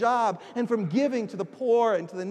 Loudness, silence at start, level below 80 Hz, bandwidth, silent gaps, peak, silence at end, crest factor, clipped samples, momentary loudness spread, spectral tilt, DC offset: -26 LUFS; 0 s; -86 dBFS; 9.8 kHz; none; -12 dBFS; 0 s; 14 dB; under 0.1%; 8 LU; -6.5 dB/octave; under 0.1%